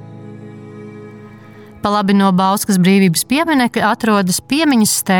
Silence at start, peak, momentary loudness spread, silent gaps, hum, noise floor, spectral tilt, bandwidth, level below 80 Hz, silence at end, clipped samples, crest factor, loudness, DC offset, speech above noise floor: 0 s; -2 dBFS; 22 LU; none; none; -38 dBFS; -4.5 dB/octave; 19.5 kHz; -52 dBFS; 0 s; under 0.1%; 12 dB; -14 LUFS; under 0.1%; 25 dB